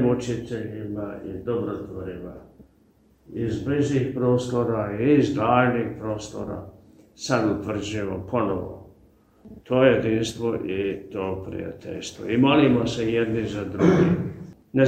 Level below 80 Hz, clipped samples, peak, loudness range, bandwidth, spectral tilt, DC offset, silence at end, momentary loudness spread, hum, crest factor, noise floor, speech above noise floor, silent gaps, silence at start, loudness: -50 dBFS; under 0.1%; -4 dBFS; 7 LU; 9.4 kHz; -6.5 dB/octave; under 0.1%; 0 s; 15 LU; none; 20 dB; -59 dBFS; 35 dB; none; 0 s; -24 LUFS